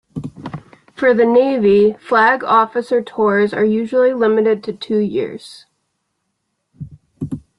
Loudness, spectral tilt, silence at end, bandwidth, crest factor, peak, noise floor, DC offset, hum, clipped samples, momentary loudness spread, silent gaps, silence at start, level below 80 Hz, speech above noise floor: -15 LUFS; -7 dB/octave; 0.2 s; 11 kHz; 14 dB; -2 dBFS; -72 dBFS; under 0.1%; none; under 0.1%; 20 LU; none; 0.15 s; -54 dBFS; 57 dB